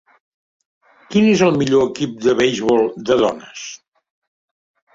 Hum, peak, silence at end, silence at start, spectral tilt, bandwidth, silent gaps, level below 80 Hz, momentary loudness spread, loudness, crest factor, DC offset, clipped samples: none; -2 dBFS; 1.2 s; 1.1 s; -5.5 dB/octave; 7.8 kHz; none; -54 dBFS; 16 LU; -16 LUFS; 16 dB; under 0.1%; under 0.1%